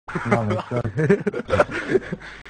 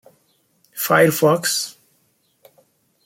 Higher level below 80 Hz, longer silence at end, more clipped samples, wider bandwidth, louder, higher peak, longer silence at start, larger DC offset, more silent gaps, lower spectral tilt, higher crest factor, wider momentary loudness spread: first, -46 dBFS vs -66 dBFS; second, 0 s vs 1.35 s; neither; second, 10 kHz vs 16.5 kHz; second, -22 LUFS vs -17 LUFS; about the same, -2 dBFS vs -2 dBFS; second, 0.1 s vs 0.75 s; neither; neither; first, -7.5 dB/octave vs -3.5 dB/octave; about the same, 20 dB vs 20 dB; second, 5 LU vs 15 LU